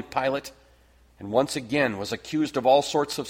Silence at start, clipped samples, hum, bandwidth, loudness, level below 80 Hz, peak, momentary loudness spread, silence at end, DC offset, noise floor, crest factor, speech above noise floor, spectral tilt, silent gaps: 0 s; under 0.1%; none; 16.5 kHz; -25 LUFS; -60 dBFS; -8 dBFS; 12 LU; 0 s; under 0.1%; -57 dBFS; 18 dB; 33 dB; -4.5 dB/octave; none